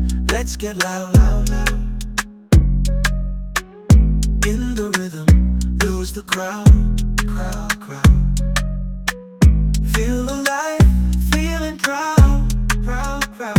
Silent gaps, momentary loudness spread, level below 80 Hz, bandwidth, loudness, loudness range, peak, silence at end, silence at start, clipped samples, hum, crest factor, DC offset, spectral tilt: none; 10 LU; -18 dBFS; 16.5 kHz; -18 LUFS; 1 LU; 0 dBFS; 0 s; 0 s; under 0.1%; none; 16 dB; under 0.1%; -5.5 dB/octave